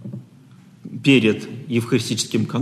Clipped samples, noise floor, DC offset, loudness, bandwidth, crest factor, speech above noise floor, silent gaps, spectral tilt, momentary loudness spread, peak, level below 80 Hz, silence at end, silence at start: under 0.1%; -47 dBFS; under 0.1%; -19 LUFS; 13 kHz; 18 dB; 28 dB; none; -5 dB/octave; 21 LU; -4 dBFS; -64 dBFS; 0 s; 0 s